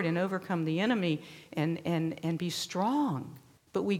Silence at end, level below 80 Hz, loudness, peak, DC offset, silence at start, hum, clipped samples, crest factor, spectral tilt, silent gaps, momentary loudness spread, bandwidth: 0 s; -72 dBFS; -32 LUFS; -16 dBFS; under 0.1%; 0 s; none; under 0.1%; 16 dB; -6 dB/octave; none; 8 LU; 16 kHz